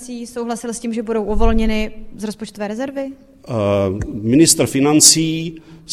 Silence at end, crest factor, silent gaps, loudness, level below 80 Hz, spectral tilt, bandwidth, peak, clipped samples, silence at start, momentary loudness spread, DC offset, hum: 0 s; 18 dB; none; -16 LUFS; -28 dBFS; -3.5 dB/octave; 16 kHz; 0 dBFS; under 0.1%; 0 s; 19 LU; under 0.1%; none